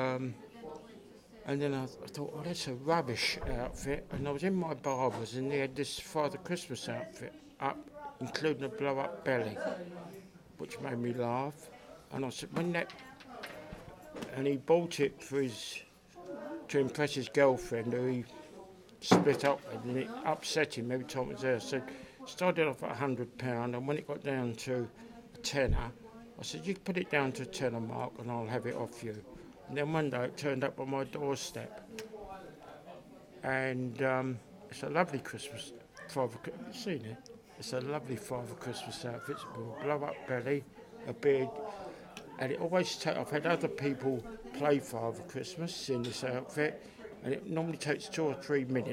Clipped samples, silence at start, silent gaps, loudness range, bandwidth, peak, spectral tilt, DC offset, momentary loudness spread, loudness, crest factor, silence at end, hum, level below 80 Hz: under 0.1%; 0 s; none; 6 LU; 16.5 kHz; -10 dBFS; -5 dB/octave; under 0.1%; 17 LU; -36 LUFS; 26 dB; 0 s; none; -56 dBFS